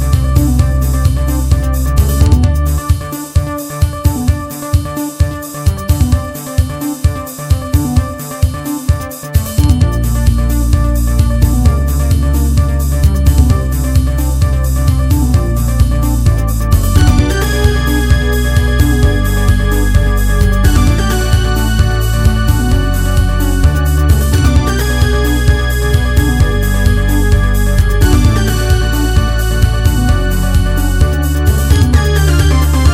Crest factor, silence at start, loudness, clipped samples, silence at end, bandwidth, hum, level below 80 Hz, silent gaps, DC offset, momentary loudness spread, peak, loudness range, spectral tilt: 10 dB; 0 s; -13 LUFS; 0.2%; 0 s; 16 kHz; none; -12 dBFS; none; under 0.1%; 6 LU; 0 dBFS; 4 LU; -6 dB/octave